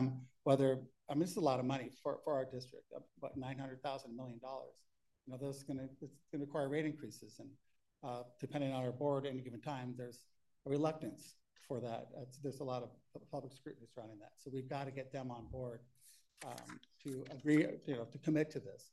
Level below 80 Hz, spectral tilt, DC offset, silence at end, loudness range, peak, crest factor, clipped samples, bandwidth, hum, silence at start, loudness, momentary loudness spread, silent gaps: -76 dBFS; -7 dB/octave; under 0.1%; 0.05 s; 8 LU; -20 dBFS; 22 dB; under 0.1%; 12 kHz; none; 0 s; -42 LUFS; 18 LU; none